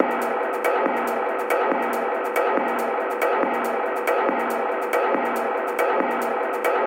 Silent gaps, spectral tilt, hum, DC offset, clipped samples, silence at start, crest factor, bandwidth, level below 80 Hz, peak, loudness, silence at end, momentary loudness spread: none; -3.5 dB/octave; none; under 0.1%; under 0.1%; 0 s; 20 dB; 17 kHz; -76 dBFS; -2 dBFS; -23 LUFS; 0 s; 3 LU